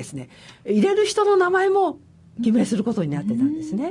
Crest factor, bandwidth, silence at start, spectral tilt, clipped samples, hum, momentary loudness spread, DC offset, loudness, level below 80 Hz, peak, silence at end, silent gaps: 12 dB; 11.5 kHz; 0 s; -5.5 dB/octave; under 0.1%; none; 15 LU; under 0.1%; -21 LUFS; -64 dBFS; -8 dBFS; 0 s; none